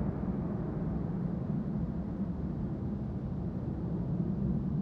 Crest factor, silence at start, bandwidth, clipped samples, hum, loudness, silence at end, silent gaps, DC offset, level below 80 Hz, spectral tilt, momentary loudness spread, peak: 14 dB; 0 s; 4.9 kHz; under 0.1%; none; -35 LUFS; 0 s; none; under 0.1%; -44 dBFS; -11.5 dB/octave; 4 LU; -20 dBFS